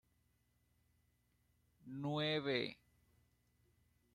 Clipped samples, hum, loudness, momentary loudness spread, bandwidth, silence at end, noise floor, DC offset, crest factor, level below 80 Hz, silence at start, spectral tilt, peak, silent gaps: under 0.1%; 60 Hz at -70 dBFS; -40 LUFS; 9 LU; 13.5 kHz; 1.4 s; -79 dBFS; under 0.1%; 22 dB; -80 dBFS; 1.85 s; -6.5 dB/octave; -24 dBFS; none